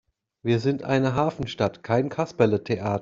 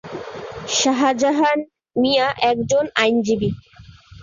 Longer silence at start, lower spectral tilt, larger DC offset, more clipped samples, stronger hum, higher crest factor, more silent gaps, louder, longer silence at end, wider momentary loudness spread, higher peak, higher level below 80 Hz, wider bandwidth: first, 0.45 s vs 0.05 s; first, -7.5 dB/octave vs -3.5 dB/octave; neither; neither; neither; about the same, 20 dB vs 18 dB; neither; second, -25 LUFS vs -19 LUFS; about the same, 0 s vs 0 s; second, 5 LU vs 15 LU; second, -6 dBFS vs -2 dBFS; second, -56 dBFS vs -50 dBFS; about the same, 7.6 kHz vs 7.6 kHz